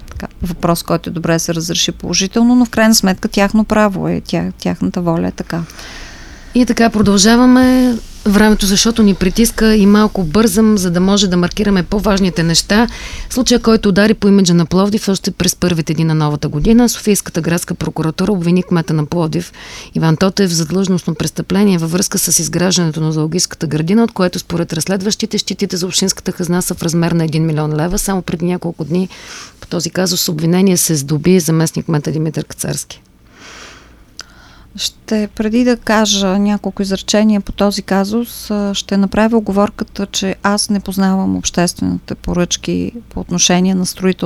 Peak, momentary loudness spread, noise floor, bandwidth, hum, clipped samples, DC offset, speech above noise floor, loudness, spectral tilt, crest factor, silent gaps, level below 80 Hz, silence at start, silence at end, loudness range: 0 dBFS; 10 LU; -41 dBFS; 15.5 kHz; none; under 0.1%; under 0.1%; 27 dB; -14 LUFS; -4.5 dB/octave; 14 dB; none; -32 dBFS; 0 s; 0 s; 6 LU